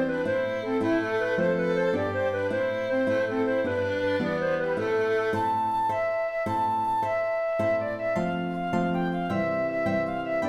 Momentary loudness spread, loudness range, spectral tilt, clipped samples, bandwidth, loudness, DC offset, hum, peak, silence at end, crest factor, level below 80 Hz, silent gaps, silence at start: 3 LU; 1 LU; -7 dB/octave; under 0.1%; 13.5 kHz; -26 LUFS; under 0.1%; none; -14 dBFS; 0 s; 12 dB; -58 dBFS; none; 0 s